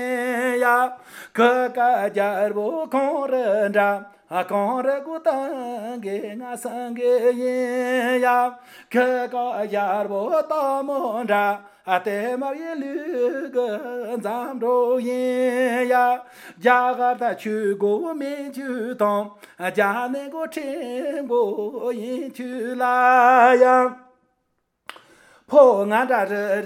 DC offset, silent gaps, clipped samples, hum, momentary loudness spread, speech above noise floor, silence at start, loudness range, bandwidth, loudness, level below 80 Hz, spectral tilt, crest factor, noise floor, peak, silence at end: under 0.1%; none; under 0.1%; none; 12 LU; 52 dB; 0 s; 6 LU; 16 kHz; -21 LUFS; -80 dBFS; -5 dB/octave; 20 dB; -72 dBFS; -2 dBFS; 0 s